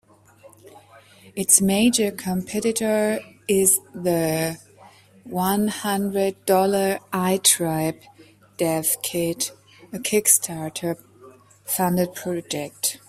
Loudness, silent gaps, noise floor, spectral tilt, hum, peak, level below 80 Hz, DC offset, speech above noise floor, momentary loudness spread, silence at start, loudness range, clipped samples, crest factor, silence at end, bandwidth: -21 LUFS; none; -51 dBFS; -3.5 dB/octave; none; 0 dBFS; -60 dBFS; under 0.1%; 29 dB; 13 LU; 0.45 s; 3 LU; under 0.1%; 22 dB; 0.1 s; 16 kHz